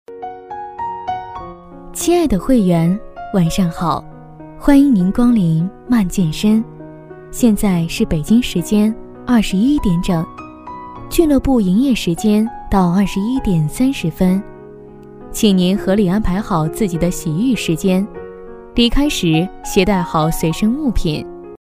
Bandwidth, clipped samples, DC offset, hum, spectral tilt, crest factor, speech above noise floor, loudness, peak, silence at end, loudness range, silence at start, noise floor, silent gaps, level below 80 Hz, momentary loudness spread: 16 kHz; under 0.1%; under 0.1%; none; -6 dB/octave; 16 dB; 22 dB; -16 LUFS; 0 dBFS; 0.1 s; 2 LU; 0.1 s; -36 dBFS; none; -30 dBFS; 16 LU